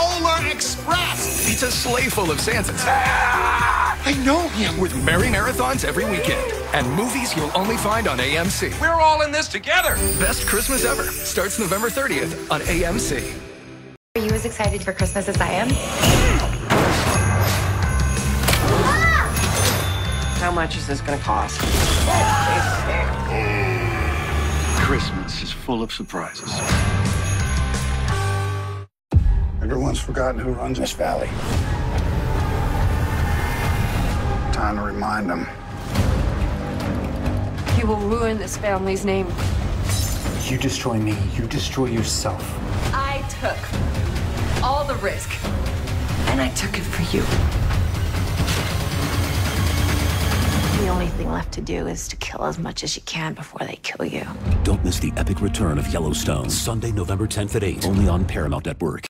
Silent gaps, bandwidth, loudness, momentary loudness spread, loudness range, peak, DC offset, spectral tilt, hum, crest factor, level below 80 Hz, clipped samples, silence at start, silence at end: 13.97-14.15 s; 16.5 kHz; -21 LUFS; 8 LU; 5 LU; -2 dBFS; under 0.1%; -4.5 dB/octave; none; 18 dB; -28 dBFS; under 0.1%; 0 s; 0 s